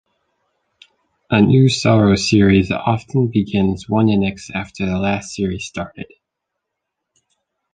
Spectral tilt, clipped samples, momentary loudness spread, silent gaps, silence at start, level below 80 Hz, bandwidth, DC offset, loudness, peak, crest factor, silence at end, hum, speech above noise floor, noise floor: -6.5 dB/octave; under 0.1%; 14 LU; none; 1.3 s; -40 dBFS; 9.4 kHz; under 0.1%; -16 LUFS; -2 dBFS; 16 dB; 1.7 s; none; 63 dB; -79 dBFS